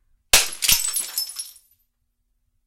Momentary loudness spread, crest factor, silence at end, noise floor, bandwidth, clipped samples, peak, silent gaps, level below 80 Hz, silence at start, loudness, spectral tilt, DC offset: 16 LU; 24 dB; 1.15 s; -71 dBFS; 17 kHz; under 0.1%; -2 dBFS; none; -42 dBFS; 0.35 s; -19 LUFS; 1.5 dB/octave; under 0.1%